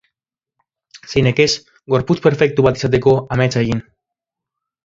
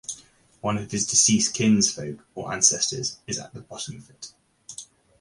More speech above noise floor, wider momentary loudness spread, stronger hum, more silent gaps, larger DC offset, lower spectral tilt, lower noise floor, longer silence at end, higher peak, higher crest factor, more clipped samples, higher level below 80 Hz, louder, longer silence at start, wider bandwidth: first, 69 dB vs 28 dB; second, 7 LU vs 22 LU; neither; neither; neither; first, -6 dB/octave vs -2.5 dB/octave; first, -84 dBFS vs -52 dBFS; first, 1.05 s vs 0.35 s; first, 0 dBFS vs -4 dBFS; about the same, 18 dB vs 22 dB; neither; first, -44 dBFS vs -58 dBFS; first, -16 LUFS vs -22 LUFS; first, 0.95 s vs 0.1 s; second, 7.8 kHz vs 11.5 kHz